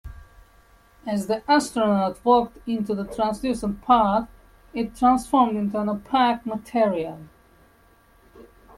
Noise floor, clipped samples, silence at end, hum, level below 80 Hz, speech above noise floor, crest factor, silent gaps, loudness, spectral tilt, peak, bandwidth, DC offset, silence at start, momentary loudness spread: -56 dBFS; under 0.1%; 0.35 s; none; -50 dBFS; 34 dB; 18 dB; none; -23 LUFS; -5.5 dB/octave; -6 dBFS; 14 kHz; under 0.1%; 0.05 s; 11 LU